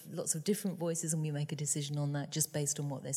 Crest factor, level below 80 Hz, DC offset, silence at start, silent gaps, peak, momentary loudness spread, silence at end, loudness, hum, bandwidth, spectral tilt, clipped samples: 18 dB; -80 dBFS; under 0.1%; 0 s; none; -16 dBFS; 3 LU; 0 s; -35 LUFS; none; 16 kHz; -4.5 dB/octave; under 0.1%